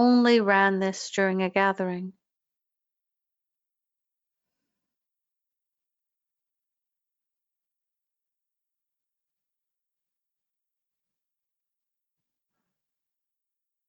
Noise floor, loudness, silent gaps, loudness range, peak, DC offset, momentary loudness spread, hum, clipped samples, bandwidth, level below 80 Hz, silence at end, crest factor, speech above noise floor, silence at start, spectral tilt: -88 dBFS; -23 LUFS; none; 14 LU; -8 dBFS; under 0.1%; 12 LU; none; under 0.1%; 8 kHz; -80 dBFS; 11.8 s; 24 dB; 65 dB; 0 s; -5 dB/octave